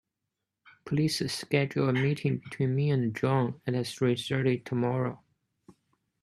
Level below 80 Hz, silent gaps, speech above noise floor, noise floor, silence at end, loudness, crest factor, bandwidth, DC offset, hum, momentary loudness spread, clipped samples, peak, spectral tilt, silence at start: -68 dBFS; none; 57 dB; -85 dBFS; 0.5 s; -29 LUFS; 20 dB; 13 kHz; under 0.1%; none; 5 LU; under 0.1%; -10 dBFS; -6.5 dB/octave; 0.85 s